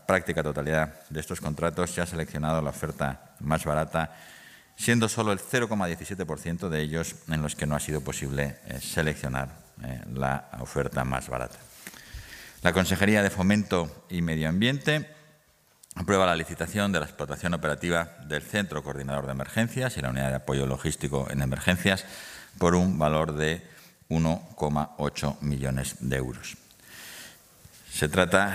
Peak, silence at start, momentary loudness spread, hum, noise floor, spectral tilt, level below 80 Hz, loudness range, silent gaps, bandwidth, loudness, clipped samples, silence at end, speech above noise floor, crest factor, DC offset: -4 dBFS; 0.1 s; 16 LU; none; -62 dBFS; -5 dB/octave; -48 dBFS; 5 LU; none; 16 kHz; -28 LUFS; under 0.1%; 0 s; 35 dB; 24 dB; under 0.1%